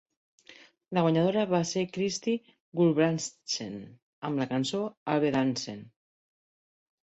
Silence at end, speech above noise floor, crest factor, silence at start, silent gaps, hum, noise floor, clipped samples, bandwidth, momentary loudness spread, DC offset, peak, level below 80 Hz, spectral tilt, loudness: 1.25 s; 28 dB; 18 dB; 0.5 s; 2.60-2.72 s, 4.02-4.22 s, 4.97-5.06 s; none; -56 dBFS; under 0.1%; 8.2 kHz; 13 LU; under 0.1%; -12 dBFS; -70 dBFS; -5.5 dB/octave; -29 LUFS